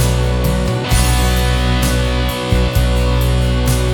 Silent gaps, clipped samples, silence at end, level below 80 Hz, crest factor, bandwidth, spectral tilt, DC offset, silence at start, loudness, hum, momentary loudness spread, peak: none; under 0.1%; 0 s; -16 dBFS; 12 dB; 18 kHz; -5 dB/octave; under 0.1%; 0 s; -15 LUFS; none; 2 LU; 0 dBFS